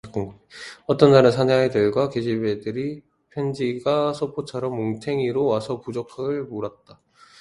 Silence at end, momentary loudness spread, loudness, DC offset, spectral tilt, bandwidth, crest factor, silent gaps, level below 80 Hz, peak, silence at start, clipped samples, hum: 0.7 s; 17 LU; -22 LUFS; under 0.1%; -7 dB/octave; 11.5 kHz; 20 dB; none; -58 dBFS; -2 dBFS; 0.05 s; under 0.1%; none